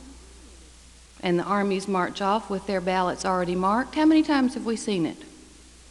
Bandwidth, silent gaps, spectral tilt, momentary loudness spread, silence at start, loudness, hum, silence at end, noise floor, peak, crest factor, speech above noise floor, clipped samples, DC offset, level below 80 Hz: 11.5 kHz; none; -5.5 dB/octave; 8 LU; 0 s; -25 LUFS; none; 0.55 s; -50 dBFS; -10 dBFS; 16 dB; 26 dB; under 0.1%; under 0.1%; -52 dBFS